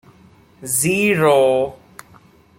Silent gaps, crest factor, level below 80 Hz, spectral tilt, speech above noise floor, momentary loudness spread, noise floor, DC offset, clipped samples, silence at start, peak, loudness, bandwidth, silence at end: none; 16 dB; -56 dBFS; -4 dB/octave; 33 dB; 11 LU; -49 dBFS; under 0.1%; under 0.1%; 0.6 s; -2 dBFS; -16 LUFS; 16.5 kHz; 0.85 s